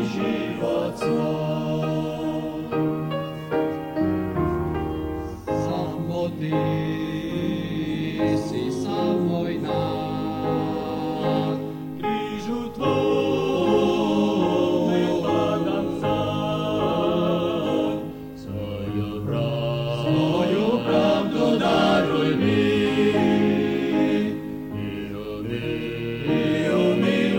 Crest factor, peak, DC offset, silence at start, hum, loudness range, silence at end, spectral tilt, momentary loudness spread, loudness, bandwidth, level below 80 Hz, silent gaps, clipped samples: 16 dB; -8 dBFS; under 0.1%; 0 s; none; 6 LU; 0 s; -7 dB/octave; 9 LU; -24 LUFS; 17 kHz; -48 dBFS; none; under 0.1%